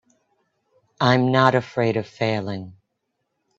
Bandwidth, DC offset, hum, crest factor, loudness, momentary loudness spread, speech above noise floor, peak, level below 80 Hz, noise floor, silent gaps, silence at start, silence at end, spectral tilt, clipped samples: 7.8 kHz; under 0.1%; none; 22 dB; -21 LUFS; 15 LU; 56 dB; 0 dBFS; -60 dBFS; -76 dBFS; none; 1 s; 0.85 s; -7 dB/octave; under 0.1%